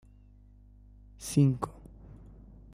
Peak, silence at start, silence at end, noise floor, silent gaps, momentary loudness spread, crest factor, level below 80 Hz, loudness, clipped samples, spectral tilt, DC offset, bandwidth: -12 dBFS; 1.2 s; 0.85 s; -56 dBFS; none; 27 LU; 22 dB; -54 dBFS; -29 LUFS; under 0.1%; -7 dB/octave; under 0.1%; 15.5 kHz